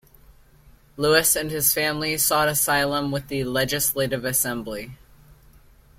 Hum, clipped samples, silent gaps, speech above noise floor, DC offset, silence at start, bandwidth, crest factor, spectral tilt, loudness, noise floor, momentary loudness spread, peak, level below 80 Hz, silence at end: none; under 0.1%; none; 30 dB; under 0.1%; 0.65 s; 16.5 kHz; 22 dB; -2.5 dB/octave; -21 LUFS; -53 dBFS; 9 LU; -4 dBFS; -50 dBFS; 1.05 s